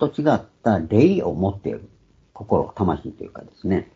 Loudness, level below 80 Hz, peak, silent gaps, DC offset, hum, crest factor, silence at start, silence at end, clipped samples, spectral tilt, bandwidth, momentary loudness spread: -21 LUFS; -48 dBFS; -2 dBFS; none; under 0.1%; none; 20 dB; 0 s; 0.1 s; under 0.1%; -9 dB/octave; 7.6 kHz; 19 LU